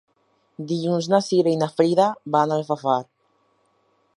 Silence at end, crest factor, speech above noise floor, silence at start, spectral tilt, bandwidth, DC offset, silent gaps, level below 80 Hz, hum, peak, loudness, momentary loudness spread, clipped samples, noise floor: 1.15 s; 18 dB; 45 dB; 0.6 s; -6.5 dB/octave; 11.5 kHz; under 0.1%; none; -74 dBFS; none; -4 dBFS; -21 LUFS; 7 LU; under 0.1%; -66 dBFS